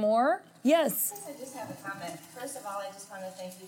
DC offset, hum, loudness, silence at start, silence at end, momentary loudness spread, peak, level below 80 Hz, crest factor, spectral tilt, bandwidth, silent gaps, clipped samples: under 0.1%; none; -31 LUFS; 0 s; 0 s; 16 LU; -12 dBFS; -86 dBFS; 18 dB; -3.5 dB/octave; 17 kHz; none; under 0.1%